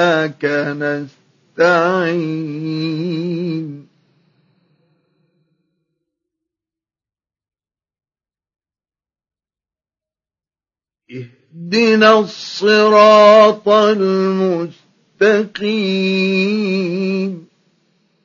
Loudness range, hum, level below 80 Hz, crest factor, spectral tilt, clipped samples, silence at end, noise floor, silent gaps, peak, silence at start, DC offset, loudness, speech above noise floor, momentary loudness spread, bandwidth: 14 LU; none; -72 dBFS; 16 dB; -6 dB/octave; under 0.1%; 0.85 s; under -90 dBFS; none; 0 dBFS; 0 s; under 0.1%; -14 LUFS; over 76 dB; 18 LU; 7.4 kHz